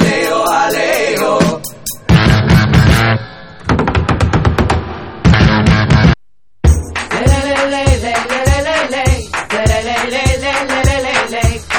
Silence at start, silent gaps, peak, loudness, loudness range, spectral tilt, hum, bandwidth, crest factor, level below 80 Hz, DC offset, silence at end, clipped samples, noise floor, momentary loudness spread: 0 s; none; 0 dBFS; -12 LUFS; 2 LU; -5.5 dB/octave; none; 18 kHz; 12 dB; -20 dBFS; 0.9%; 0 s; 0.3%; -62 dBFS; 8 LU